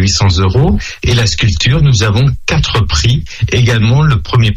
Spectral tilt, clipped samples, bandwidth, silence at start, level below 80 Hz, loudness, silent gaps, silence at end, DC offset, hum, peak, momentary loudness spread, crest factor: -5 dB/octave; under 0.1%; 10 kHz; 0 s; -22 dBFS; -11 LUFS; none; 0 s; under 0.1%; none; 0 dBFS; 4 LU; 10 dB